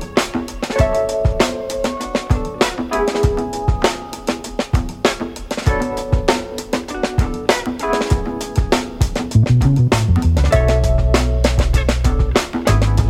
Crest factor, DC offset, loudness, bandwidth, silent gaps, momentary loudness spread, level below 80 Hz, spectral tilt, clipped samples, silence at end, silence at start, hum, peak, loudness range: 16 dB; under 0.1%; -18 LUFS; 15.5 kHz; none; 8 LU; -22 dBFS; -6 dB/octave; under 0.1%; 0 s; 0 s; none; -2 dBFS; 4 LU